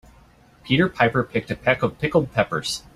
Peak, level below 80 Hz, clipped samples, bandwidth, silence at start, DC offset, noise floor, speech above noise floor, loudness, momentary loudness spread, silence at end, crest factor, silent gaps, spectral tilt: -2 dBFS; -50 dBFS; under 0.1%; 15 kHz; 0.65 s; under 0.1%; -52 dBFS; 31 dB; -22 LUFS; 5 LU; 0.15 s; 20 dB; none; -5.5 dB/octave